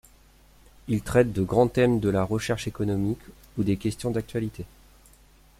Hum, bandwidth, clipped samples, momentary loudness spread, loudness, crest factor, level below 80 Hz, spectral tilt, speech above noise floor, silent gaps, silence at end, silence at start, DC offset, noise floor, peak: none; 16 kHz; under 0.1%; 14 LU; -26 LUFS; 22 dB; -48 dBFS; -7 dB/octave; 31 dB; none; 0.95 s; 0.85 s; under 0.1%; -55 dBFS; -6 dBFS